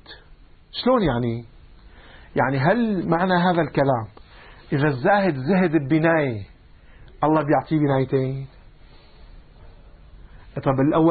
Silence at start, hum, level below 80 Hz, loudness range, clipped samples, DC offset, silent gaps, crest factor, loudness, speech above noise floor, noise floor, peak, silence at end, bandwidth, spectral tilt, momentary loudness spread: 0.1 s; none; -46 dBFS; 4 LU; under 0.1%; under 0.1%; none; 16 dB; -21 LUFS; 28 dB; -48 dBFS; -6 dBFS; 0 s; 4.8 kHz; -12 dB/octave; 10 LU